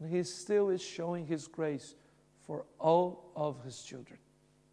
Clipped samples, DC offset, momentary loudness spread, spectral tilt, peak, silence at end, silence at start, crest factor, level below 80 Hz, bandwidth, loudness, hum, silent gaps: under 0.1%; under 0.1%; 17 LU; -5.5 dB/octave; -16 dBFS; 0.55 s; 0 s; 20 dB; -78 dBFS; 10.5 kHz; -35 LUFS; none; none